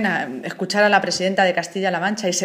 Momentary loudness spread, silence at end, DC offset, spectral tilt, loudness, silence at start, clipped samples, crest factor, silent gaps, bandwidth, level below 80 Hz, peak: 8 LU; 0 s; under 0.1%; -3.5 dB/octave; -19 LUFS; 0 s; under 0.1%; 18 dB; none; 15.5 kHz; -68 dBFS; 0 dBFS